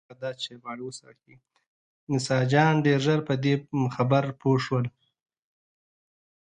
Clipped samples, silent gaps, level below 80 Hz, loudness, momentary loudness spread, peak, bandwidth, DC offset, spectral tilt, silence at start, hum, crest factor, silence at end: under 0.1%; 1.67-2.07 s; -66 dBFS; -25 LUFS; 16 LU; -8 dBFS; 9.8 kHz; under 0.1%; -6.5 dB/octave; 0.1 s; none; 20 dB; 1.55 s